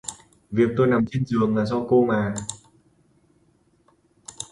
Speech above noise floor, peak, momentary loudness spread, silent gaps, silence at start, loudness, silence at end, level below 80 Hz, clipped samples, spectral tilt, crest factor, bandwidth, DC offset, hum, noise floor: 41 dB; -6 dBFS; 17 LU; none; 0.05 s; -22 LUFS; 0.1 s; -54 dBFS; under 0.1%; -6.5 dB/octave; 18 dB; 11.5 kHz; under 0.1%; none; -62 dBFS